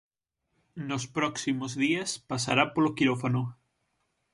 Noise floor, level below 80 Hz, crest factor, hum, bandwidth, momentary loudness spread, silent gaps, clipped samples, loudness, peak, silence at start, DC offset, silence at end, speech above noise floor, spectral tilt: -81 dBFS; -66 dBFS; 22 dB; none; 11.5 kHz; 10 LU; none; under 0.1%; -28 LUFS; -8 dBFS; 0.75 s; under 0.1%; 0.8 s; 52 dB; -4.5 dB/octave